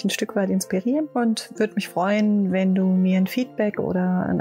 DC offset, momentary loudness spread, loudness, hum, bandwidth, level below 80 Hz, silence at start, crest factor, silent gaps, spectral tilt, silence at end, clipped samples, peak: under 0.1%; 5 LU; -22 LUFS; none; 16 kHz; -60 dBFS; 0 s; 12 dB; none; -6 dB/octave; 0 s; under 0.1%; -10 dBFS